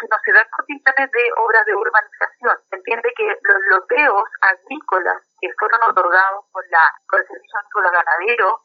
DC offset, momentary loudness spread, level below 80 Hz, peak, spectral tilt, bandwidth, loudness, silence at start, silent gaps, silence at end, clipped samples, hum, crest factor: under 0.1%; 10 LU; -82 dBFS; 0 dBFS; 3 dB/octave; 6.4 kHz; -16 LUFS; 0 s; none; 0.1 s; under 0.1%; none; 18 dB